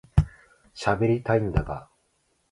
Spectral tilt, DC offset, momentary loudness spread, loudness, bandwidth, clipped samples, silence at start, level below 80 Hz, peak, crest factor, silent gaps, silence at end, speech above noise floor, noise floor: -7.5 dB/octave; under 0.1%; 14 LU; -26 LUFS; 11.5 kHz; under 0.1%; 0.15 s; -36 dBFS; -4 dBFS; 22 dB; none; 0.7 s; 46 dB; -70 dBFS